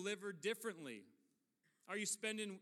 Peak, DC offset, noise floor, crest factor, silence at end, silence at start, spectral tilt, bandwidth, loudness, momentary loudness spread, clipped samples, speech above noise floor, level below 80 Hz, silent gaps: -28 dBFS; under 0.1%; -83 dBFS; 18 dB; 0 s; 0 s; -2.5 dB/octave; 16 kHz; -45 LUFS; 12 LU; under 0.1%; 37 dB; under -90 dBFS; none